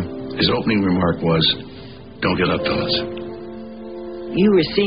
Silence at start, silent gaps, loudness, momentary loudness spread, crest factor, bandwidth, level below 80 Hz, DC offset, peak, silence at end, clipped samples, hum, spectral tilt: 0 s; none; -19 LUFS; 17 LU; 16 dB; 5.4 kHz; -46 dBFS; 0.4%; -4 dBFS; 0 s; under 0.1%; none; -11 dB/octave